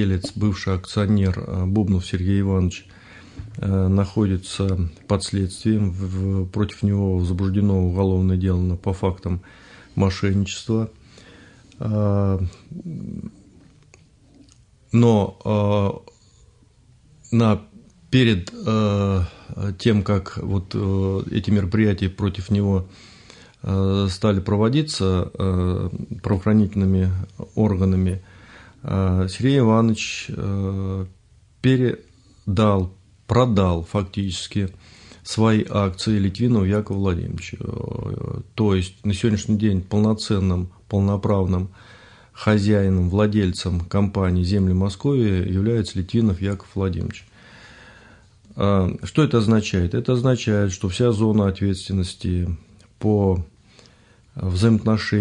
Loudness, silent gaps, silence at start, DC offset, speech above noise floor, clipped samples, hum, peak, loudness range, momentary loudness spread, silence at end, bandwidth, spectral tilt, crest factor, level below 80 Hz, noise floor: -21 LUFS; none; 0 s; under 0.1%; 34 dB; under 0.1%; none; -4 dBFS; 3 LU; 11 LU; 0 s; 10.5 kHz; -7 dB/octave; 16 dB; -48 dBFS; -54 dBFS